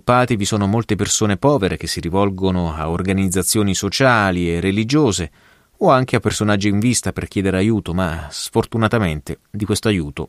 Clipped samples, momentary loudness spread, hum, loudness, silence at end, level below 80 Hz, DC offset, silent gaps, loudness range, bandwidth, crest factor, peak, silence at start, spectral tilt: under 0.1%; 7 LU; none; -18 LUFS; 0 s; -40 dBFS; under 0.1%; none; 2 LU; 15.5 kHz; 16 dB; -2 dBFS; 0.05 s; -5 dB/octave